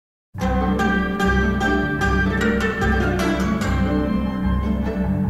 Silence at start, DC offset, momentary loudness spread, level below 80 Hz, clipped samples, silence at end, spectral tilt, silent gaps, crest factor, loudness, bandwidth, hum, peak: 0.35 s; under 0.1%; 3 LU; -28 dBFS; under 0.1%; 0 s; -6.5 dB/octave; none; 14 dB; -20 LUFS; 13.5 kHz; none; -6 dBFS